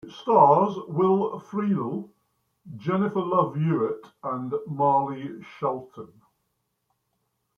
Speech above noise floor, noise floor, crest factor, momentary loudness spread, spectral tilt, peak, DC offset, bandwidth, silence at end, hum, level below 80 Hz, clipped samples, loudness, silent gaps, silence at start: 52 dB; -76 dBFS; 22 dB; 17 LU; -9.5 dB/octave; -4 dBFS; under 0.1%; 6.6 kHz; 1.5 s; none; -72 dBFS; under 0.1%; -24 LUFS; none; 0.05 s